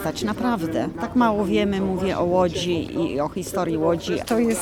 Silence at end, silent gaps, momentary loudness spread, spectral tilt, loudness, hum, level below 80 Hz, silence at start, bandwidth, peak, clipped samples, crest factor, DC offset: 0 s; none; 6 LU; -5.5 dB/octave; -23 LUFS; none; -46 dBFS; 0 s; 18.5 kHz; -8 dBFS; under 0.1%; 14 dB; under 0.1%